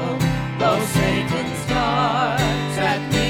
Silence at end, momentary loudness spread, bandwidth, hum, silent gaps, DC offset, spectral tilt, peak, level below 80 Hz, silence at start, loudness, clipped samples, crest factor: 0 s; 3 LU; 19 kHz; none; none; under 0.1%; -5 dB/octave; -6 dBFS; -36 dBFS; 0 s; -20 LUFS; under 0.1%; 14 dB